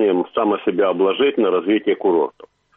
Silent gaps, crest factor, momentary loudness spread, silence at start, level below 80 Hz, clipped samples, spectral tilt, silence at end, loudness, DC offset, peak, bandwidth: none; 12 dB; 3 LU; 0 s; -64 dBFS; under 0.1%; -9 dB/octave; 0.45 s; -18 LUFS; under 0.1%; -6 dBFS; 3.9 kHz